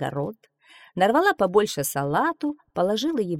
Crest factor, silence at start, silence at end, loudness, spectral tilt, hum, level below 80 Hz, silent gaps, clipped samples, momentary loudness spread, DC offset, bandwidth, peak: 18 dB; 0 s; 0 s; -23 LUFS; -4.5 dB/octave; none; -60 dBFS; none; under 0.1%; 11 LU; under 0.1%; 17 kHz; -6 dBFS